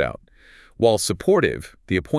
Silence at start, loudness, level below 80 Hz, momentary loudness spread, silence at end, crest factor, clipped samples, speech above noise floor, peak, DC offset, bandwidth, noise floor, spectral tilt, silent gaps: 0 s; -21 LUFS; -46 dBFS; 12 LU; 0 s; 18 dB; under 0.1%; 30 dB; -4 dBFS; under 0.1%; 12 kHz; -50 dBFS; -5 dB/octave; none